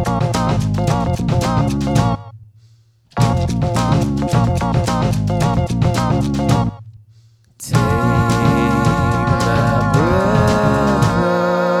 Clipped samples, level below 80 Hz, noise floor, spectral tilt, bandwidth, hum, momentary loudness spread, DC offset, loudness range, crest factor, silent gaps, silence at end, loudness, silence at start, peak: under 0.1%; -30 dBFS; -50 dBFS; -6.5 dB/octave; 14 kHz; none; 4 LU; under 0.1%; 4 LU; 16 dB; none; 0 s; -16 LUFS; 0 s; 0 dBFS